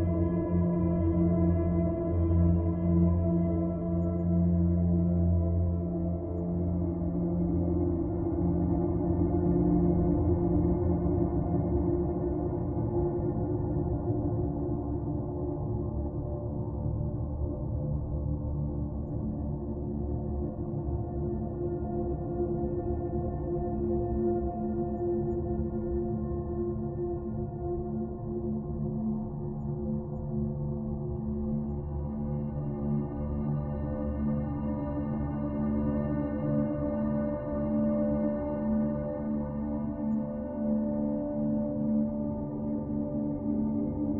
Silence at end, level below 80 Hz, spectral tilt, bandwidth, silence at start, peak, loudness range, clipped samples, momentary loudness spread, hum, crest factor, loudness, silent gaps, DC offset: 0 s; -40 dBFS; -14.5 dB/octave; 2.9 kHz; 0 s; -14 dBFS; 6 LU; under 0.1%; 7 LU; none; 14 dB; -31 LUFS; none; under 0.1%